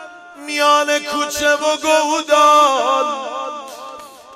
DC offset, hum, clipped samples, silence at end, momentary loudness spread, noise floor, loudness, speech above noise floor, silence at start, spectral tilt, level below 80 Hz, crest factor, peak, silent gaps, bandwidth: under 0.1%; none; under 0.1%; 0 s; 20 LU; -36 dBFS; -15 LUFS; 20 dB; 0 s; -0.5 dB/octave; -58 dBFS; 14 dB; -2 dBFS; none; 16 kHz